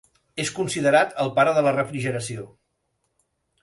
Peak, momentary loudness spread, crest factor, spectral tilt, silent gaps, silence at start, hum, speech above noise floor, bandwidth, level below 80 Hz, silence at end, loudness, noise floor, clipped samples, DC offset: -4 dBFS; 13 LU; 20 dB; -4.5 dB/octave; none; 0.35 s; none; 52 dB; 11.5 kHz; -62 dBFS; 1.15 s; -22 LUFS; -74 dBFS; under 0.1%; under 0.1%